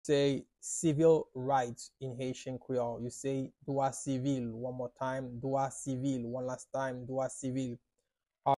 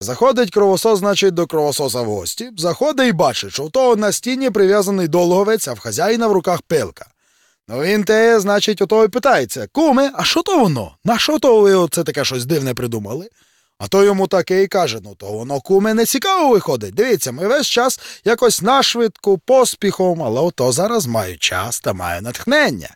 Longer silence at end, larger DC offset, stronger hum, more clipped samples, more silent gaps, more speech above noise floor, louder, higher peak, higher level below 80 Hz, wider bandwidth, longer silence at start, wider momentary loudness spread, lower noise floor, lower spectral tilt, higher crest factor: about the same, 0 s vs 0.05 s; neither; neither; neither; neither; first, 52 dB vs 44 dB; second, -35 LUFS vs -16 LUFS; second, -16 dBFS vs -4 dBFS; second, -68 dBFS vs -54 dBFS; second, 12 kHz vs 17.5 kHz; about the same, 0.05 s vs 0 s; about the same, 10 LU vs 9 LU; first, -86 dBFS vs -59 dBFS; first, -5.5 dB/octave vs -4 dB/octave; first, 18 dB vs 12 dB